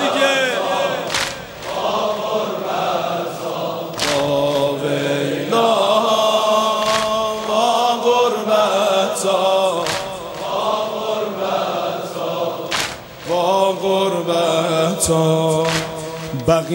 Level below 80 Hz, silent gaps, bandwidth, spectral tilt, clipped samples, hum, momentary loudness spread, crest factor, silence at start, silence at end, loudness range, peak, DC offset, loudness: -50 dBFS; none; 16.5 kHz; -3.5 dB/octave; under 0.1%; none; 9 LU; 16 dB; 0 s; 0 s; 5 LU; -2 dBFS; under 0.1%; -18 LUFS